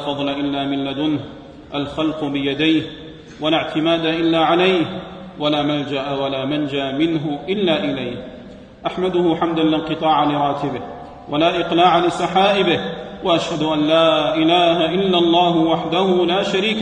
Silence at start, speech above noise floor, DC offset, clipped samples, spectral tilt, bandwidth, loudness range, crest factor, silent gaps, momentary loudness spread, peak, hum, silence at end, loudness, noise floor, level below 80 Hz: 0 s; 20 dB; under 0.1%; under 0.1%; -6 dB/octave; 9.4 kHz; 5 LU; 16 dB; none; 13 LU; -2 dBFS; none; 0 s; -18 LUFS; -38 dBFS; -50 dBFS